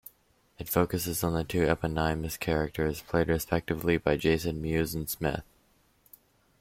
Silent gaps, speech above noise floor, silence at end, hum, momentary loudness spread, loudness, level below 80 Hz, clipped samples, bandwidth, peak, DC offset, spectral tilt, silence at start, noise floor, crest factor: none; 38 dB; 1.2 s; none; 5 LU; -29 LUFS; -46 dBFS; under 0.1%; 16.5 kHz; -12 dBFS; under 0.1%; -5.5 dB/octave; 0.6 s; -66 dBFS; 18 dB